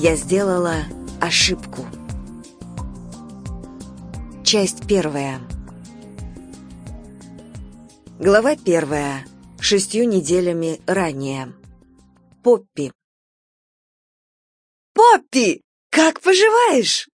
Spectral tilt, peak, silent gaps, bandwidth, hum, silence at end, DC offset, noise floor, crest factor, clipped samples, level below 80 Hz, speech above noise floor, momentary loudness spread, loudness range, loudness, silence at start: -3.5 dB/octave; 0 dBFS; 12.95-14.95 s, 15.64-15.90 s; 10.5 kHz; none; 0.15 s; under 0.1%; -52 dBFS; 20 dB; under 0.1%; -42 dBFS; 35 dB; 24 LU; 8 LU; -17 LUFS; 0 s